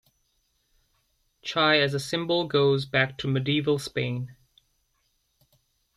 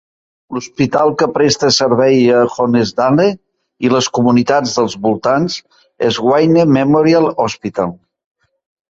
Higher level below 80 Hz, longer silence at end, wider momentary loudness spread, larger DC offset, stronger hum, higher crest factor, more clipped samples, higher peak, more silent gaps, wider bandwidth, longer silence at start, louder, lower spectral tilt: second, -62 dBFS vs -52 dBFS; first, 1.65 s vs 1 s; about the same, 10 LU vs 10 LU; neither; neither; first, 20 dB vs 12 dB; neither; second, -8 dBFS vs -2 dBFS; neither; first, 13 kHz vs 7.8 kHz; first, 1.45 s vs 0.5 s; second, -25 LUFS vs -13 LUFS; about the same, -5.5 dB/octave vs -5 dB/octave